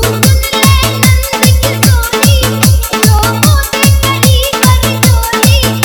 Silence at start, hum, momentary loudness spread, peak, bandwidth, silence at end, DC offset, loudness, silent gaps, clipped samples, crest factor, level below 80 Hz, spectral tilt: 0 s; none; 1 LU; 0 dBFS; over 20 kHz; 0 s; under 0.1%; -8 LUFS; none; 1%; 8 dB; -14 dBFS; -4 dB/octave